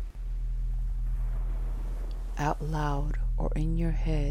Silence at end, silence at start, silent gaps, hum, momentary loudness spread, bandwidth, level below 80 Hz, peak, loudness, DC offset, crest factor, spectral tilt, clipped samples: 0 s; 0 s; none; none; 8 LU; 7 kHz; -30 dBFS; -14 dBFS; -33 LUFS; under 0.1%; 14 dB; -7.5 dB/octave; under 0.1%